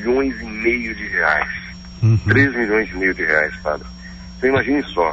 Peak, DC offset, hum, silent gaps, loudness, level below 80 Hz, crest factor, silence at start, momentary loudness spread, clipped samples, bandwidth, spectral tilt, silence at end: -2 dBFS; under 0.1%; none; none; -18 LUFS; -38 dBFS; 16 dB; 0 s; 14 LU; under 0.1%; 7.8 kHz; -7.5 dB/octave; 0 s